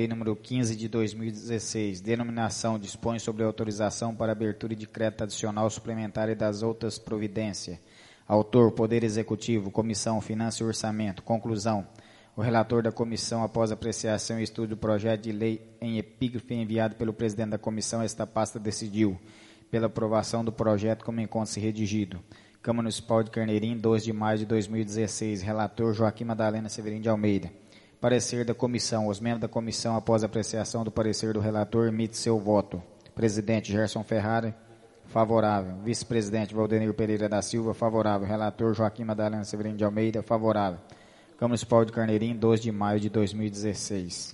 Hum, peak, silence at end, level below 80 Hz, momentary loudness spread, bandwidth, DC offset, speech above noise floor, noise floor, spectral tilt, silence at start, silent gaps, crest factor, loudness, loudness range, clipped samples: none; -8 dBFS; 0 s; -60 dBFS; 7 LU; 11.5 kHz; under 0.1%; 24 dB; -52 dBFS; -5.5 dB/octave; 0 s; none; 22 dB; -29 LUFS; 3 LU; under 0.1%